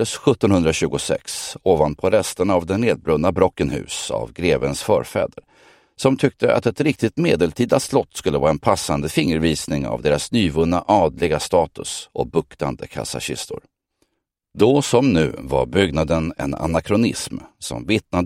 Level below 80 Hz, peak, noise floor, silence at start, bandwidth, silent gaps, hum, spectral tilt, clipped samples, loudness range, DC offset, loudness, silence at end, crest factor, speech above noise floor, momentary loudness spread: -42 dBFS; 0 dBFS; -75 dBFS; 0 s; 16 kHz; none; none; -5.5 dB/octave; under 0.1%; 3 LU; under 0.1%; -20 LUFS; 0 s; 20 dB; 56 dB; 10 LU